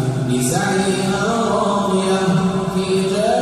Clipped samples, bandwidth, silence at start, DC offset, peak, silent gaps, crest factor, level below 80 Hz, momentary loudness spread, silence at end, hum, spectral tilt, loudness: under 0.1%; 14 kHz; 0 s; under 0.1%; -6 dBFS; none; 12 dB; -46 dBFS; 2 LU; 0 s; none; -5.5 dB/octave; -18 LUFS